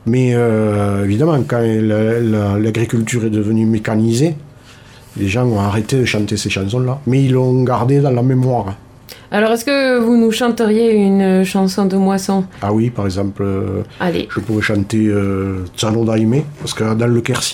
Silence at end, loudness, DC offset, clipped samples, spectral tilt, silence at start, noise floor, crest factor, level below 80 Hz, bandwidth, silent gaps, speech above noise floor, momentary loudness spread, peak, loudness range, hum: 0 s; -15 LUFS; under 0.1%; under 0.1%; -6.5 dB/octave; 0.05 s; -40 dBFS; 14 dB; -46 dBFS; 16.5 kHz; none; 26 dB; 7 LU; 0 dBFS; 4 LU; none